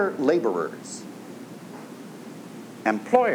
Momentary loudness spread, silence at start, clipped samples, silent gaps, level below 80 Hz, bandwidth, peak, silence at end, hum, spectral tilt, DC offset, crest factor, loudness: 19 LU; 0 s; under 0.1%; none; -86 dBFS; 19.5 kHz; -4 dBFS; 0 s; none; -5.5 dB/octave; under 0.1%; 22 dB; -25 LUFS